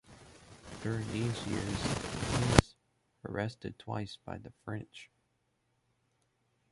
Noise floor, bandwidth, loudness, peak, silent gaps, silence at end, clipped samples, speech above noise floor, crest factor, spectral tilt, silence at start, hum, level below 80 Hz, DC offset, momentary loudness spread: -78 dBFS; 11.5 kHz; -35 LUFS; -2 dBFS; none; 1.65 s; under 0.1%; 40 dB; 34 dB; -5 dB/octave; 0.1 s; none; -48 dBFS; under 0.1%; 24 LU